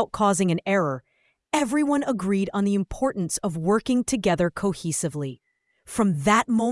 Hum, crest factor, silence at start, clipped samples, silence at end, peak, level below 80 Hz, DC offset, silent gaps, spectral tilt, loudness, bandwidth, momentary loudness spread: none; 20 dB; 0 s; under 0.1%; 0 s; -4 dBFS; -52 dBFS; under 0.1%; none; -5 dB/octave; -24 LUFS; 12 kHz; 7 LU